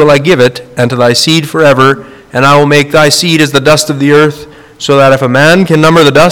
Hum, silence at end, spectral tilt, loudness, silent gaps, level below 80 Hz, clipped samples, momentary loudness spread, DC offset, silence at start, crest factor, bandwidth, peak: none; 0 s; -4.5 dB/octave; -6 LUFS; none; -40 dBFS; 6%; 7 LU; 1%; 0 s; 6 dB; 19.5 kHz; 0 dBFS